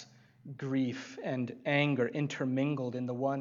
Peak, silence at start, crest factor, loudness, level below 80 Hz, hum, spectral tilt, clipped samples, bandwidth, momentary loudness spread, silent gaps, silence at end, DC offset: -14 dBFS; 0 s; 18 dB; -33 LUFS; -82 dBFS; none; -7 dB/octave; under 0.1%; 7.6 kHz; 9 LU; none; 0 s; under 0.1%